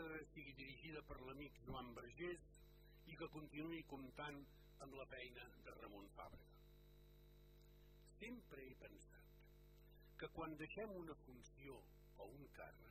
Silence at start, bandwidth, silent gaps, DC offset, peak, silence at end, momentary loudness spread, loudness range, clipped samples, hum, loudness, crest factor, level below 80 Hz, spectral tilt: 0 s; 14.5 kHz; none; under 0.1%; -40 dBFS; 0 s; 17 LU; 7 LU; under 0.1%; 50 Hz at -70 dBFS; -57 LUFS; 18 dB; -68 dBFS; -5.5 dB/octave